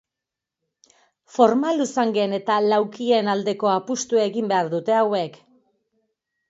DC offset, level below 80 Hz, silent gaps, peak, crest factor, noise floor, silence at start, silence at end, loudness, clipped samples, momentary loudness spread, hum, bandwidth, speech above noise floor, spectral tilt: under 0.1%; -74 dBFS; none; -2 dBFS; 22 dB; -86 dBFS; 1.35 s; 1.2 s; -21 LUFS; under 0.1%; 5 LU; none; 8 kHz; 66 dB; -4.5 dB/octave